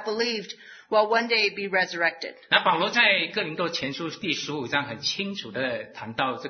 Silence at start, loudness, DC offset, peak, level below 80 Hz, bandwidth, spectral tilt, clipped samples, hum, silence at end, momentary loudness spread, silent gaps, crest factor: 0 s; -25 LUFS; under 0.1%; -4 dBFS; -70 dBFS; 6.6 kHz; -3 dB/octave; under 0.1%; none; 0 s; 11 LU; none; 24 dB